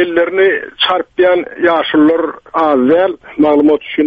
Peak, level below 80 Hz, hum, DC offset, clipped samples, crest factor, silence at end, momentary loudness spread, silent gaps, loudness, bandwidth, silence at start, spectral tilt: 0 dBFS; -50 dBFS; none; under 0.1%; under 0.1%; 10 dB; 0 s; 5 LU; none; -12 LUFS; 5 kHz; 0 s; -7 dB/octave